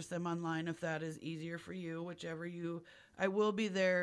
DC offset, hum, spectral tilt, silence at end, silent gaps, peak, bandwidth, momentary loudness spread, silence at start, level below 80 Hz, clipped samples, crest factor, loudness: under 0.1%; none; -5.5 dB/octave; 0 s; none; -20 dBFS; 11 kHz; 10 LU; 0 s; -78 dBFS; under 0.1%; 18 dB; -39 LUFS